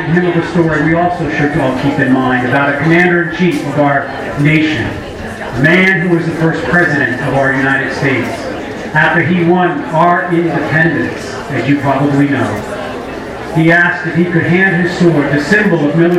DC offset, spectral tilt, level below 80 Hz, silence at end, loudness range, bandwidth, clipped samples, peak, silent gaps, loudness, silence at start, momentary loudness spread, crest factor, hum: under 0.1%; -7 dB/octave; -40 dBFS; 0 s; 2 LU; 13 kHz; 0.1%; 0 dBFS; none; -12 LUFS; 0 s; 10 LU; 12 dB; none